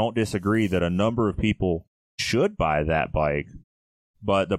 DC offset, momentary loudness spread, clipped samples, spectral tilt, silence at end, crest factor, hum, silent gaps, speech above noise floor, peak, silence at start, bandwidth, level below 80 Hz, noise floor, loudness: under 0.1%; 8 LU; under 0.1%; -6 dB/octave; 0 s; 16 dB; none; 1.87-2.18 s, 3.64-4.14 s; over 67 dB; -8 dBFS; 0 s; 14.5 kHz; -40 dBFS; under -90 dBFS; -24 LUFS